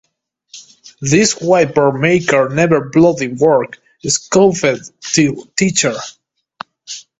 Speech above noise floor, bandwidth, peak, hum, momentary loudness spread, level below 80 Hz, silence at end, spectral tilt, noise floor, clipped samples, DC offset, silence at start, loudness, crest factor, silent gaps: 39 dB; 8.4 kHz; 0 dBFS; none; 16 LU; -50 dBFS; 0.2 s; -4.5 dB/octave; -52 dBFS; under 0.1%; under 0.1%; 0.55 s; -13 LUFS; 14 dB; none